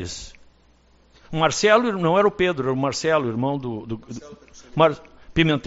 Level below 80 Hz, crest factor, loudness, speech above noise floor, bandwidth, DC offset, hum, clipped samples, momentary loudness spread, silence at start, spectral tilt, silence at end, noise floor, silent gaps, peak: -48 dBFS; 20 dB; -21 LUFS; 35 dB; 8 kHz; under 0.1%; none; under 0.1%; 18 LU; 0 s; -4 dB/octave; 0.05 s; -56 dBFS; none; -2 dBFS